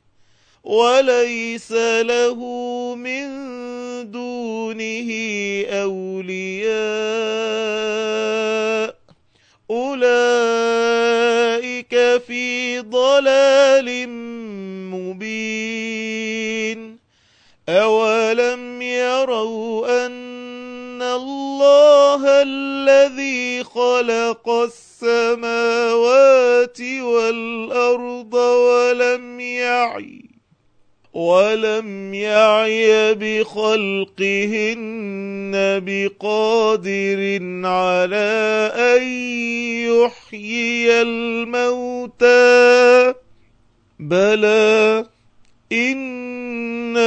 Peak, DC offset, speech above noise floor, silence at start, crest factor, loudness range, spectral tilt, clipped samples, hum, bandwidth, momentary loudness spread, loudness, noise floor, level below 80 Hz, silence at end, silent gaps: 0 dBFS; under 0.1%; 41 dB; 0.65 s; 16 dB; 8 LU; -3.5 dB/octave; under 0.1%; none; 8.6 kHz; 14 LU; -17 LUFS; -58 dBFS; -66 dBFS; 0 s; none